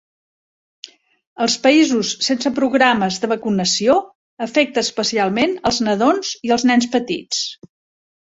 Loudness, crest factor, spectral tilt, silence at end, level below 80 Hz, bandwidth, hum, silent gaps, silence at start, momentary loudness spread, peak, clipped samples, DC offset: -17 LUFS; 18 dB; -3.5 dB/octave; 0.75 s; -56 dBFS; 8 kHz; none; 4.15-4.37 s; 1.4 s; 7 LU; -2 dBFS; under 0.1%; under 0.1%